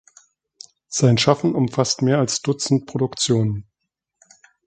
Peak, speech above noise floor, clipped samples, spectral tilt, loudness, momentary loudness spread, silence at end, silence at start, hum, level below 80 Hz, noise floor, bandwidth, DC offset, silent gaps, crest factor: 0 dBFS; 61 dB; under 0.1%; -5 dB/octave; -20 LUFS; 8 LU; 1.05 s; 0.9 s; none; -56 dBFS; -80 dBFS; 9.4 kHz; under 0.1%; none; 20 dB